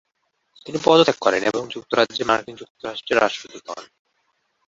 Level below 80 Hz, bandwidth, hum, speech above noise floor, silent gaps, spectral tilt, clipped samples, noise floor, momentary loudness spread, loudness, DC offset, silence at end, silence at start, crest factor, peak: -62 dBFS; 7.8 kHz; none; 51 dB; 2.70-2.75 s; -4 dB/octave; under 0.1%; -72 dBFS; 20 LU; -20 LUFS; under 0.1%; 0.8 s; 0.65 s; 20 dB; -2 dBFS